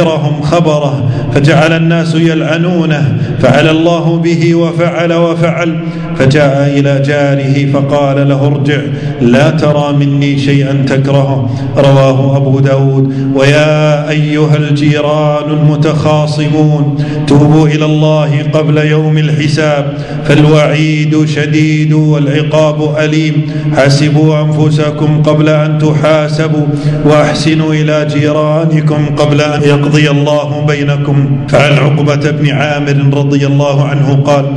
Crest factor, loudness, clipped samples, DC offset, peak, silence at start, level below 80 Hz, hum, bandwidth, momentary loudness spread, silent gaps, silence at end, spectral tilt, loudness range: 8 dB; -9 LUFS; 2%; under 0.1%; 0 dBFS; 0 s; -38 dBFS; none; 9.8 kHz; 4 LU; none; 0 s; -7 dB/octave; 1 LU